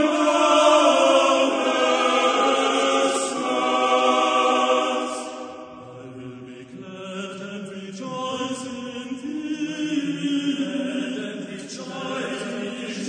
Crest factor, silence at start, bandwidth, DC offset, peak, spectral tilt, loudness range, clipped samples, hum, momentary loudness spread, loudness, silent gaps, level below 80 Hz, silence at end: 18 dB; 0 s; 9.8 kHz; under 0.1%; -6 dBFS; -3 dB/octave; 14 LU; under 0.1%; none; 20 LU; -21 LUFS; none; -70 dBFS; 0 s